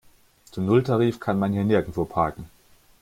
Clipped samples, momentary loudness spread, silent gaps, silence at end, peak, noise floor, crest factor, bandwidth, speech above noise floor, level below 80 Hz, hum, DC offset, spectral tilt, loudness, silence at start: under 0.1%; 9 LU; none; 0.55 s; -6 dBFS; -55 dBFS; 18 dB; 16 kHz; 33 dB; -52 dBFS; none; under 0.1%; -8.5 dB/octave; -23 LUFS; 0.55 s